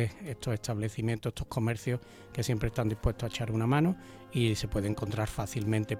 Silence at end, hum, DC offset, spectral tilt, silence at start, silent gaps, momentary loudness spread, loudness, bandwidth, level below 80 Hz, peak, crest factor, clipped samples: 0 s; none; under 0.1%; -6 dB/octave; 0 s; none; 7 LU; -32 LUFS; 16 kHz; -46 dBFS; -14 dBFS; 16 dB; under 0.1%